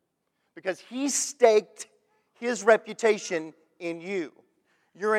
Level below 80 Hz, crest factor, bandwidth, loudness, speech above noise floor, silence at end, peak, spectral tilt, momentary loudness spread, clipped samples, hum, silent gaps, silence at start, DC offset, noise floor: -88 dBFS; 22 dB; 15 kHz; -26 LUFS; 51 dB; 0 s; -6 dBFS; -2.5 dB/octave; 20 LU; under 0.1%; none; none; 0.55 s; under 0.1%; -77 dBFS